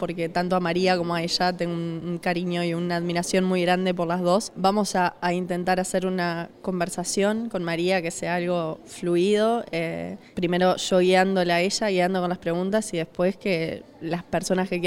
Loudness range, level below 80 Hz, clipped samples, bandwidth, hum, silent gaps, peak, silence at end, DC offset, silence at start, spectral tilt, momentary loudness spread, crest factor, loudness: 3 LU; -56 dBFS; under 0.1%; 16.5 kHz; none; none; -8 dBFS; 0 s; under 0.1%; 0 s; -5 dB/octave; 8 LU; 16 dB; -24 LUFS